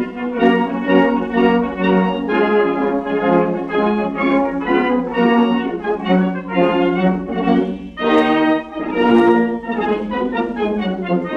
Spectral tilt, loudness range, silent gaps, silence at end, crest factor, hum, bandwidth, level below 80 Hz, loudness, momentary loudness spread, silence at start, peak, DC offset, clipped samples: -8 dB/octave; 1 LU; none; 0 s; 14 dB; none; 6.8 kHz; -46 dBFS; -17 LUFS; 6 LU; 0 s; -2 dBFS; under 0.1%; under 0.1%